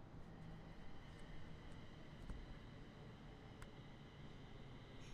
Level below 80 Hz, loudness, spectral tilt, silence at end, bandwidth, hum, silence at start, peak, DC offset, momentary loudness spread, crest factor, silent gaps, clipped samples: -60 dBFS; -59 LUFS; -6 dB/octave; 0 s; 11 kHz; none; 0 s; -40 dBFS; under 0.1%; 3 LU; 16 dB; none; under 0.1%